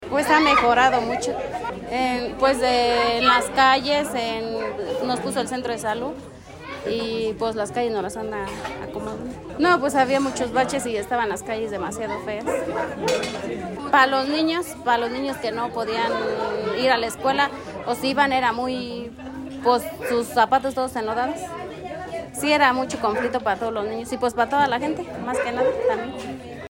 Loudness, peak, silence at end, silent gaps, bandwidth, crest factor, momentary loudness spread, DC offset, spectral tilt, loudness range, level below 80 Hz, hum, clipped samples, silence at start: -22 LUFS; -4 dBFS; 0 s; none; 16.5 kHz; 18 dB; 14 LU; under 0.1%; -3.5 dB/octave; 6 LU; -52 dBFS; none; under 0.1%; 0 s